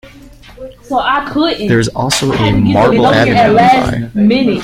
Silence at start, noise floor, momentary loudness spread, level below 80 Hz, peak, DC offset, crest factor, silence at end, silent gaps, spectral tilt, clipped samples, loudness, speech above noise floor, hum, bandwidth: 0.05 s; -36 dBFS; 6 LU; -34 dBFS; 0 dBFS; under 0.1%; 12 dB; 0 s; none; -5.5 dB/octave; under 0.1%; -11 LUFS; 26 dB; none; 16 kHz